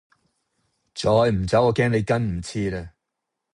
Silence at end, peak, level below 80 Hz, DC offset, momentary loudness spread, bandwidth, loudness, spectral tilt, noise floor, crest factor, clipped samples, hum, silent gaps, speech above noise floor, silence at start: 0.65 s; -6 dBFS; -44 dBFS; under 0.1%; 10 LU; 11 kHz; -22 LUFS; -6.5 dB/octave; -82 dBFS; 18 dB; under 0.1%; none; none; 61 dB; 0.95 s